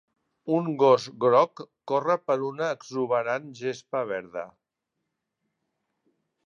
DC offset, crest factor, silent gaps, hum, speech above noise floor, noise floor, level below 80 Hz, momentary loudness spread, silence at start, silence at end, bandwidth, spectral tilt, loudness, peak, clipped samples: under 0.1%; 20 dB; none; none; 57 dB; -83 dBFS; -78 dBFS; 15 LU; 0.45 s; 2 s; 7.4 kHz; -6 dB/octave; -26 LUFS; -8 dBFS; under 0.1%